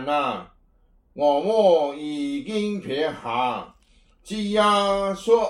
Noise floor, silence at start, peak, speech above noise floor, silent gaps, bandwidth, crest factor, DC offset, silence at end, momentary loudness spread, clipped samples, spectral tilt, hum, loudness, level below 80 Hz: -59 dBFS; 0 s; -6 dBFS; 37 dB; none; 12 kHz; 18 dB; under 0.1%; 0 s; 10 LU; under 0.1%; -5 dB/octave; none; -23 LUFS; -56 dBFS